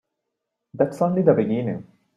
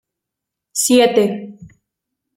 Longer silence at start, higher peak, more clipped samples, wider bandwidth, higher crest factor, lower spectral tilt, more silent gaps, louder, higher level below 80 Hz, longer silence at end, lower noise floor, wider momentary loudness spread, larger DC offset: about the same, 0.75 s vs 0.75 s; about the same, -4 dBFS vs -2 dBFS; neither; second, 11.5 kHz vs 16.5 kHz; about the same, 20 dB vs 18 dB; first, -9.5 dB/octave vs -3 dB/octave; neither; second, -21 LUFS vs -15 LUFS; about the same, -62 dBFS vs -62 dBFS; second, 0.35 s vs 0.7 s; about the same, -81 dBFS vs -82 dBFS; second, 11 LU vs 17 LU; neither